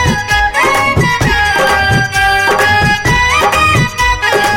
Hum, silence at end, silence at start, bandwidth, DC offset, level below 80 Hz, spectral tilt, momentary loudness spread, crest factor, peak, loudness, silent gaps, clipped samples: none; 0 s; 0 s; 17 kHz; under 0.1%; -26 dBFS; -3.5 dB/octave; 2 LU; 10 dB; 0 dBFS; -10 LUFS; none; under 0.1%